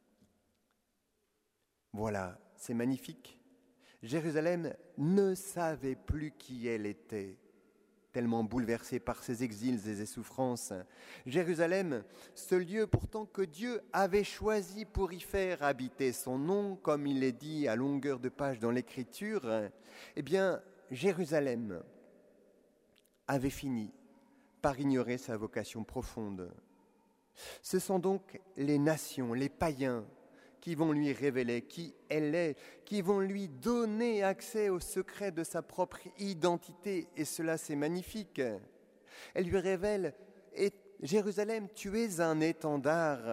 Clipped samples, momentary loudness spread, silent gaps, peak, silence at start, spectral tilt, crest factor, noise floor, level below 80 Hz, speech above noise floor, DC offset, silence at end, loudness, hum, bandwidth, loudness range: under 0.1%; 12 LU; none; -12 dBFS; 1.95 s; -6 dB/octave; 24 dB; -81 dBFS; -58 dBFS; 46 dB; under 0.1%; 0 s; -36 LUFS; none; 16 kHz; 4 LU